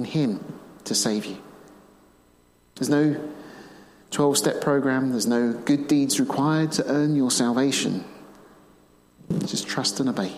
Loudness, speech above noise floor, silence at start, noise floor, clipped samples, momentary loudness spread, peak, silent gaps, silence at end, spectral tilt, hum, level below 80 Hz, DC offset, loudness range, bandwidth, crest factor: -23 LUFS; 36 dB; 0 s; -59 dBFS; under 0.1%; 14 LU; -8 dBFS; none; 0 s; -4.5 dB/octave; none; -64 dBFS; under 0.1%; 6 LU; 15.5 kHz; 16 dB